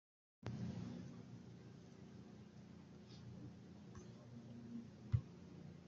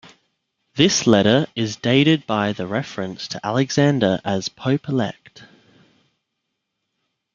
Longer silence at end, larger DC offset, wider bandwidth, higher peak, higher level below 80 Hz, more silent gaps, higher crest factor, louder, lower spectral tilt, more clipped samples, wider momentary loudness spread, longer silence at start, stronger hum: second, 0 s vs 1.9 s; neither; about the same, 7.4 kHz vs 7.6 kHz; second, -24 dBFS vs 0 dBFS; second, -70 dBFS vs -58 dBFS; neither; first, 26 dB vs 20 dB; second, -53 LUFS vs -19 LUFS; first, -8 dB/octave vs -5 dB/octave; neither; first, 15 LU vs 12 LU; second, 0.4 s vs 0.75 s; neither